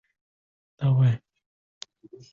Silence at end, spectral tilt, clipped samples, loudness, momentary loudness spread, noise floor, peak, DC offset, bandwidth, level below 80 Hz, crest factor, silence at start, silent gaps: 1.15 s; -8 dB/octave; under 0.1%; -24 LUFS; 23 LU; under -90 dBFS; -12 dBFS; under 0.1%; 7.4 kHz; -62 dBFS; 16 dB; 0.8 s; none